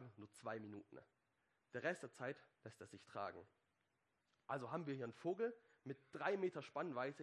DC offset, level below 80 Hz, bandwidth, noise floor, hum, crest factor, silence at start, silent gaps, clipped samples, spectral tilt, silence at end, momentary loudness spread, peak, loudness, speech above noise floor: under 0.1%; under -90 dBFS; 11.5 kHz; -87 dBFS; none; 22 dB; 0 s; none; under 0.1%; -6 dB/octave; 0 s; 16 LU; -26 dBFS; -48 LUFS; 39 dB